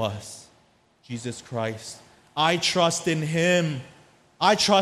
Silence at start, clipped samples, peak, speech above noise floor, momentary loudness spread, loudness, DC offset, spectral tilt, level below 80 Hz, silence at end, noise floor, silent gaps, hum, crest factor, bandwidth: 0 s; under 0.1%; -4 dBFS; 37 dB; 18 LU; -24 LUFS; under 0.1%; -4 dB/octave; -62 dBFS; 0 s; -61 dBFS; none; none; 20 dB; 14.5 kHz